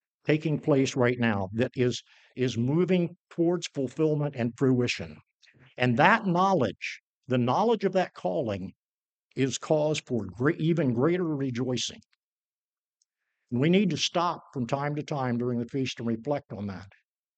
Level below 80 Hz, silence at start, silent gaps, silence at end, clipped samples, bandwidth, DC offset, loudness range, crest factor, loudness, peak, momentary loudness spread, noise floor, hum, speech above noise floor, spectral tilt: -66 dBFS; 0.25 s; 3.18-3.25 s, 5.34-5.39 s, 7.00-7.22 s, 8.76-9.30 s, 12.26-12.93 s; 0.5 s; under 0.1%; 9 kHz; under 0.1%; 4 LU; 24 dB; -27 LUFS; -4 dBFS; 10 LU; under -90 dBFS; none; over 63 dB; -6 dB/octave